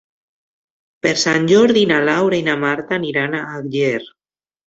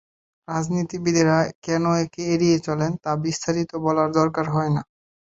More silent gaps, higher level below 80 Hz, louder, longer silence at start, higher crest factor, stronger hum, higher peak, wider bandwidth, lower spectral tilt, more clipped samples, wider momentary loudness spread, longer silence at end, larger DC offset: second, none vs 1.55-1.62 s; about the same, -58 dBFS vs -58 dBFS; first, -16 LUFS vs -22 LUFS; first, 1.05 s vs 0.5 s; about the same, 16 dB vs 18 dB; neither; about the same, -2 dBFS vs -4 dBFS; about the same, 8 kHz vs 8 kHz; second, -4.5 dB/octave vs -6 dB/octave; neither; first, 9 LU vs 6 LU; first, 0.6 s vs 0.45 s; neither